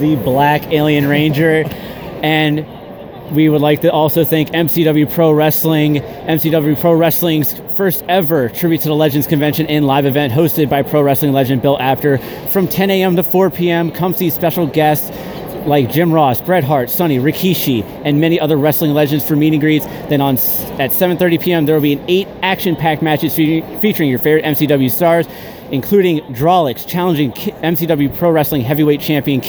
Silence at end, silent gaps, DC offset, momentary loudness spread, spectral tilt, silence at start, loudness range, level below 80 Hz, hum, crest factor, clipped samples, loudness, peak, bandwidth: 0 s; none; under 0.1%; 5 LU; -6.5 dB/octave; 0 s; 2 LU; -44 dBFS; none; 12 dB; under 0.1%; -13 LUFS; 0 dBFS; over 20 kHz